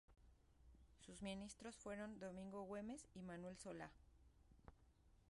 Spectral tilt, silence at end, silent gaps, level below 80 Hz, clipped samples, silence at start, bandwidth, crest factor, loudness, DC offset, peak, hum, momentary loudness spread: -5 dB/octave; 0 s; none; -72 dBFS; under 0.1%; 0.1 s; 11.5 kHz; 18 dB; -55 LUFS; under 0.1%; -38 dBFS; none; 5 LU